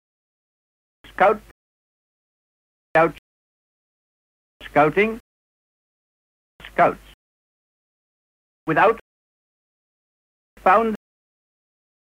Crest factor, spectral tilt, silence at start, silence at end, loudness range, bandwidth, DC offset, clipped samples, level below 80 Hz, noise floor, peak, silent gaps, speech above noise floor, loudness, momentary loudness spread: 20 dB; -7 dB/octave; 1.2 s; 1.15 s; 5 LU; 16 kHz; under 0.1%; under 0.1%; -56 dBFS; under -90 dBFS; -4 dBFS; 1.51-2.95 s, 3.19-4.60 s, 5.20-6.59 s, 7.14-8.66 s, 9.01-10.57 s; over 72 dB; -20 LUFS; 17 LU